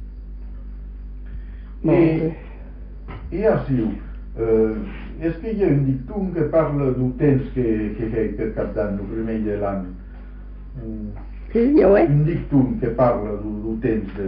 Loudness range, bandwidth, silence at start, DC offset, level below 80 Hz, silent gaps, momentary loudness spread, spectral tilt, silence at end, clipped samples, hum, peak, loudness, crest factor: 6 LU; 5.2 kHz; 0 s; under 0.1%; -34 dBFS; none; 20 LU; -9.5 dB/octave; 0 s; under 0.1%; none; -6 dBFS; -21 LUFS; 16 dB